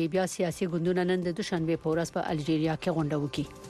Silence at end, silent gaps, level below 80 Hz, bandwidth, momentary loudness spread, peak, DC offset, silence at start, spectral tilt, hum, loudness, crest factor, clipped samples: 0 s; none; -58 dBFS; 13.5 kHz; 3 LU; -16 dBFS; under 0.1%; 0 s; -6 dB/octave; none; -29 LUFS; 14 dB; under 0.1%